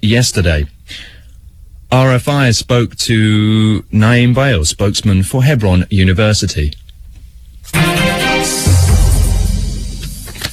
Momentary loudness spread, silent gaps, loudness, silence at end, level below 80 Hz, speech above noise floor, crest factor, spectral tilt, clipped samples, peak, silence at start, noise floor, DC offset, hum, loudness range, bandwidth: 12 LU; none; -12 LUFS; 0 s; -22 dBFS; 26 dB; 12 dB; -5 dB/octave; under 0.1%; 0 dBFS; 0.05 s; -37 dBFS; 0.4%; none; 2 LU; 15 kHz